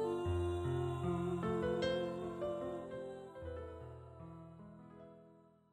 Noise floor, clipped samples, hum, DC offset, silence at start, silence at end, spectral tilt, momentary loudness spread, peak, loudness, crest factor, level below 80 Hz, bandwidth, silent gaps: -65 dBFS; under 0.1%; none; under 0.1%; 0 s; 0.3 s; -7.5 dB/octave; 19 LU; -24 dBFS; -40 LUFS; 16 dB; -58 dBFS; 11 kHz; none